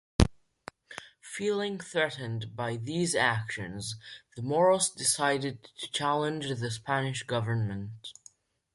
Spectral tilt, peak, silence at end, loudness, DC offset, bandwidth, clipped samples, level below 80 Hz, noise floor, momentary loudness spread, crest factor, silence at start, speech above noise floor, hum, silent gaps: -4 dB/octave; -4 dBFS; 0.6 s; -30 LUFS; under 0.1%; 12 kHz; under 0.1%; -44 dBFS; -59 dBFS; 19 LU; 26 dB; 0.2 s; 29 dB; none; none